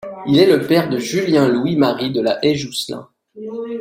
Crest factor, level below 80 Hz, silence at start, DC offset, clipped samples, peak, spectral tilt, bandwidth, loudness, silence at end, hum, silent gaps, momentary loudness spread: 16 dB; -56 dBFS; 0.05 s; under 0.1%; under 0.1%; -2 dBFS; -5.5 dB/octave; 16.5 kHz; -16 LUFS; 0 s; none; none; 15 LU